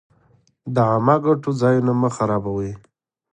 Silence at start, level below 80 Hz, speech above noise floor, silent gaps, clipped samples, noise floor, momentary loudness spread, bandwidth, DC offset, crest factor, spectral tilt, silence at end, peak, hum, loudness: 0.65 s; -52 dBFS; 40 dB; none; under 0.1%; -59 dBFS; 13 LU; 9.6 kHz; under 0.1%; 18 dB; -8 dB/octave; 0.55 s; -4 dBFS; none; -19 LUFS